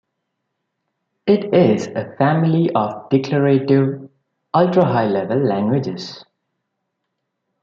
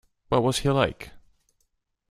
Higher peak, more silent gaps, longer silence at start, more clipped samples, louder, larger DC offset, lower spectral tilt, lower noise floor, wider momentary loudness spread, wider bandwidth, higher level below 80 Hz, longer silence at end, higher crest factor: first, -2 dBFS vs -6 dBFS; neither; first, 1.25 s vs 0.3 s; neither; first, -17 LUFS vs -24 LUFS; neither; first, -8 dB/octave vs -5.5 dB/octave; about the same, -76 dBFS vs -74 dBFS; second, 11 LU vs 20 LU; second, 7.6 kHz vs 15 kHz; second, -62 dBFS vs -48 dBFS; first, 1.45 s vs 0.95 s; second, 16 dB vs 22 dB